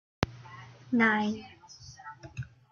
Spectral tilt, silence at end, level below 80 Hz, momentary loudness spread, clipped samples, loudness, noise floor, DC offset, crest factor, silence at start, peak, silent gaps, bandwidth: -5.5 dB/octave; 0.25 s; -58 dBFS; 24 LU; under 0.1%; -29 LUFS; -51 dBFS; under 0.1%; 26 dB; 0.2 s; -8 dBFS; none; 7 kHz